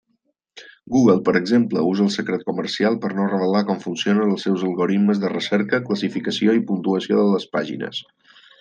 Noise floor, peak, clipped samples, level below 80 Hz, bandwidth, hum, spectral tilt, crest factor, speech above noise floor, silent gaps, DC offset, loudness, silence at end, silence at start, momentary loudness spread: -70 dBFS; -2 dBFS; under 0.1%; -64 dBFS; 8.6 kHz; none; -6 dB/octave; 18 dB; 50 dB; none; under 0.1%; -20 LUFS; 0.6 s; 0.55 s; 7 LU